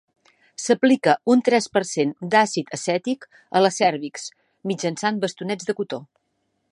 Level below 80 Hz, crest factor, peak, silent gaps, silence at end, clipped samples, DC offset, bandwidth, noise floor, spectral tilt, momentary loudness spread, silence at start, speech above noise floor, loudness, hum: -72 dBFS; 20 dB; -2 dBFS; none; 0.65 s; under 0.1%; under 0.1%; 11.5 kHz; -72 dBFS; -4.5 dB/octave; 14 LU; 0.6 s; 51 dB; -22 LUFS; none